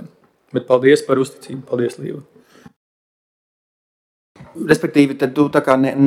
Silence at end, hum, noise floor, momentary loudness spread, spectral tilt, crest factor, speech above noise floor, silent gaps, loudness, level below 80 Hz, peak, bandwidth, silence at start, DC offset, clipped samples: 0 s; none; -46 dBFS; 16 LU; -6.5 dB/octave; 18 dB; 30 dB; 2.76-4.35 s; -17 LUFS; -60 dBFS; 0 dBFS; 14.5 kHz; 0 s; under 0.1%; under 0.1%